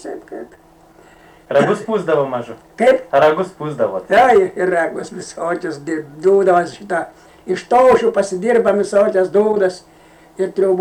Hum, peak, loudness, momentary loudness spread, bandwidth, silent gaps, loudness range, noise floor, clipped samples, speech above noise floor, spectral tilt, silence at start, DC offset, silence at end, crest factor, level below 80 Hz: none; -4 dBFS; -16 LUFS; 15 LU; 11.5 kHz; none; 3 LU; -47 dBFS; under 0.1%; 31 dB; -5.5 dB/octave; 0.05 s; under 0.1%; 0 s; 12 dB; -54 dBFS